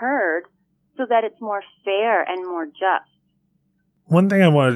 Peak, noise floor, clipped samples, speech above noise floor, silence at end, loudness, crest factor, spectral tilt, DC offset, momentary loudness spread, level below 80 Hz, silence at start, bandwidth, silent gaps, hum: -4 dBFS; -67 dBFS; under 0.1%; 48 dB; 0 s; -20 LUFS; 16 dB; -7.5 dB/octave; under 0.1%; 13 LU; -78 dBFS; 0 s; 12 kHz; none; none